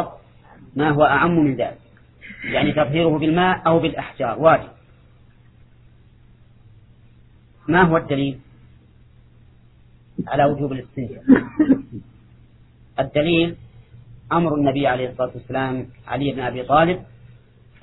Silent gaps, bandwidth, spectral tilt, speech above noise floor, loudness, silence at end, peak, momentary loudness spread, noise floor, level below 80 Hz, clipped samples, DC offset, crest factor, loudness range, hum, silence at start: none; 4.1 kHz; -10.5 dB/octave; 31 dB; -19 LUFS; 0.8 s; 0 dBFS; 16 LU; -50 dBFS; -48 dBFS; under 0.1%; under 0.1%; 20 dB; 5 LU; none; 0 s